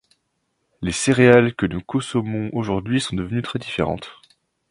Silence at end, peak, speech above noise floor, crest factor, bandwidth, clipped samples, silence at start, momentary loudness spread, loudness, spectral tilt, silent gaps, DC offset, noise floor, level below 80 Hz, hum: 0.6 s; 0 dBFS; 52 dB; 22 dB; 11 kHz; under 0.1%; 0.8 s; 13 LU; -20 LUFS; -5.5 dB/octave; none; under 0.1%; -72 dBFS; -46 dBFS; none